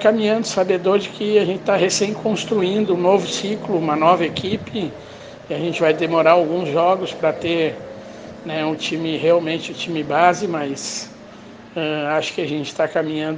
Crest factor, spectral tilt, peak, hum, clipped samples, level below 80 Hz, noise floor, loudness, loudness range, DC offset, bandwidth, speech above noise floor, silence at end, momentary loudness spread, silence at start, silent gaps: 20 dB; -4.5 dB/octave; 0 dBFS; none; under 0.1%; -60 dBFS; -40 dBFS; -19 LUFS; 3 LU; under 0.1%; 10 kHz; 21 dB; 0 s; 13 LU; 0 s; none